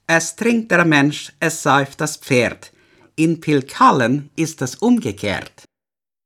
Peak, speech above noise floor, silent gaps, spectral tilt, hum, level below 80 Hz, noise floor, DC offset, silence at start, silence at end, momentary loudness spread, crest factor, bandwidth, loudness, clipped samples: -2 dBFS; over 73 dB; none; -4.5 dB/octave; none; -60 dBFS; under -90 dBFS; under 0.1%; 0.1 s; 0.8 s; 10 LU; 16 dB; 16 kHz; -17 LUFS; under 0.1%